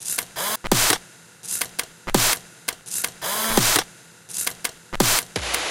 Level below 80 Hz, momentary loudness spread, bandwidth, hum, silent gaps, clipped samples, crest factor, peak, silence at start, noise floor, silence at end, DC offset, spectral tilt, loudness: -42 dBFS; 12 LU; 17 kHz; none; none; under 0.1%; 24 dB; 0 dBFS; 0 s; -45 dBFS; 0 s; under 0.1%; -1.5 dB/octave; -22 LUFS